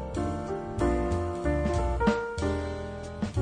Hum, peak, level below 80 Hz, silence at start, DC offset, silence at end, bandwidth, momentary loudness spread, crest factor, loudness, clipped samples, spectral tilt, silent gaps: none; -12 dBFS; -36 dBFS; 0 s; under 0.1%; 0 s; 10.5 kHz; 8 LU; 18 dB; -30 LUFS; under 0.1%; -7 dB/octave; none